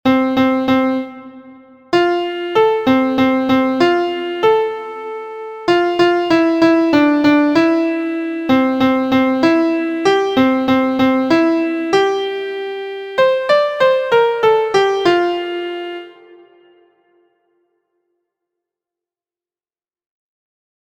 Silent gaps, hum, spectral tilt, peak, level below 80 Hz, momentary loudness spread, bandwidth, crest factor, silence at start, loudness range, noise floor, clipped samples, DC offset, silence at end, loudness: none; none; -5.5 dB/octave; 0 dBFS; -54 dBFS; 11 LU; 15 kHz; 16 dB; 0.05 s; 4 LU; under -90 dBFS; under 0.1%; under 0.1%; 4.9 s; -15 LUFS